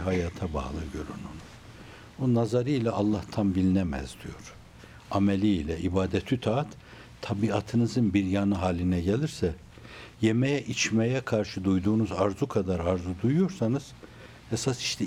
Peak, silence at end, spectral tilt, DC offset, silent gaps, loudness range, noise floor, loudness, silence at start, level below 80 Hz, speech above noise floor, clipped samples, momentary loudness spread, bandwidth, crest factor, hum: -10 dBFS; 0 s; -6 dB/octave; under 0.1%; none; 3 LU; -49 dBFS; -28 LUFS; 0 s; -50 dBFS; 22 dB; under 0.1%; 20 LU; 13.5 kHz; 18 dB; none